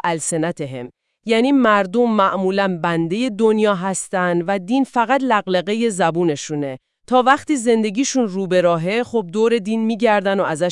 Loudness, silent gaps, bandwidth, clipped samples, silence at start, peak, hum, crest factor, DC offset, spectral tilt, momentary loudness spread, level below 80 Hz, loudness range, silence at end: -18 LUFS; none; 12 kHz; under 0.1%; 0.05 s; 0 dBFS; none; 18 dB; under 0.1%; -5 dB/octave; 8 LU; -64 dBFS; 1 LU; 0 s